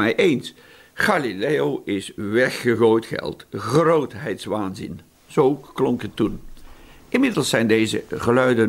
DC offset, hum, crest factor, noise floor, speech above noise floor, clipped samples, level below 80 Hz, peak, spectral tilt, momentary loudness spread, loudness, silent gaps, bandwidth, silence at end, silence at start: under 0.1%; none; 16 dB; -43 dBFS; 23 dB; under 0.1%; -50 dBFS; -4 dBFS; -5.5 dB/octave; 12 LU; -21 LUFS; none; 16 kHz; 0 s; 0 s